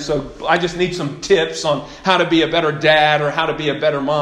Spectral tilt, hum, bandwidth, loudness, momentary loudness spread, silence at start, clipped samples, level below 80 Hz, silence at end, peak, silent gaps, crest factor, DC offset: -4.5 dB/octave; none; 11.5 kHz; -17 LUFS; 8 LU; 0 s; under 0.1%; -44 dBFS; 0 s; 0 dBFS; none; 16 dB; under 0.1%